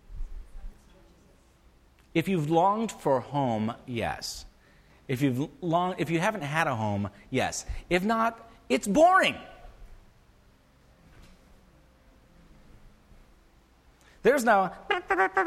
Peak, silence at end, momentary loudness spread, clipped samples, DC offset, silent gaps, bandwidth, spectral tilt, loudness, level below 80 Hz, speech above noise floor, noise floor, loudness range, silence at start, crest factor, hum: -10 dBFS; 0 s; 14 LU; under 0.1%; under 0.1%; none; 15.5 kHz; -5 dB/octave; -27 LUFS; -48 dBFS; 33 dB; -60 dBFS; 4 LU; 0.1 s; 20 dB; none